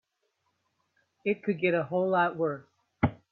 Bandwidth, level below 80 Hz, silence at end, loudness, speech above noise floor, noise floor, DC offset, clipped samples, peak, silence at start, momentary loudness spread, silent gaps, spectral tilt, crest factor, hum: 4.6 kHz; -58 dBFS; 0.15 s; -29 LUFS; 50 dB; -78 dBFS; under 0.1%; under 0.1%; -10 dBFS; 1.25 s; 7 LU; none; -9.5 dB/octave; 20 dB; none